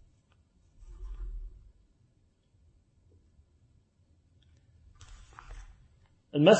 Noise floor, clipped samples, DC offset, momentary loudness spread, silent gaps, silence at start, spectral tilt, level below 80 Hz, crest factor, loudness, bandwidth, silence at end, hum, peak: -68 dBFS; under 0.1%; under 0.1%; 22 LU; none; 0.9 s; -5.5 dB/octave; -50 dBFS; 26 dB; -35 LUFS; 8.4 kHz; 0 s; none; -8 dBFS